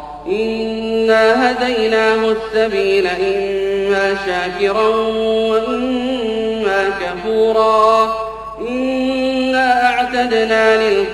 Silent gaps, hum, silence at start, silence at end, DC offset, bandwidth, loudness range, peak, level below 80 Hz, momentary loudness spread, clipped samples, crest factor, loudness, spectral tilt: none; none; 0 s; 0 s; under 0.1%; 12 kHz; 2 LU; -2 dBFS; -44 dBFS; 7 LU; under 0.1%; 12 dB; -15 LUFS; -4.5 dB/octave